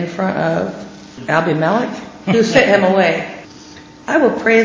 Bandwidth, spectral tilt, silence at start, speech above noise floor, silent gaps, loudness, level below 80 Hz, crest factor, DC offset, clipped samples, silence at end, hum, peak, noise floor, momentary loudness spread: 7.6 kHz; -5.5 dB/octave; 0 s; 24 dB; none; -15 LUFS; -54 dBFS; 16 dB; under 0.1%; under 0.1%; 0 s; none; 0 dBFS; -38 dBFS; 19 LU